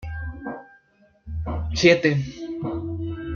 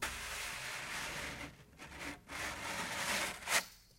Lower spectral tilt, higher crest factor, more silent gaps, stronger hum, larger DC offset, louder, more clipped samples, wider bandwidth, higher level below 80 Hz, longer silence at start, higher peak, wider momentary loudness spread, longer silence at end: first, -5.5 dB/octave vs -1 dB/octave; about the same, 22 dB vs 26 dB; neither; neither; neither; first, -23 LUFS vs -39 LUFS; neither; second, 7.2 kHz vs 16 kHz; first, -40 dBFS vs -60 dBFS; about the same, 0 s vs 0 s; first, -2 dBFS vs -16 dBFS; first, 19 LU vs 13 LU; about the same, 0 s vs 0 s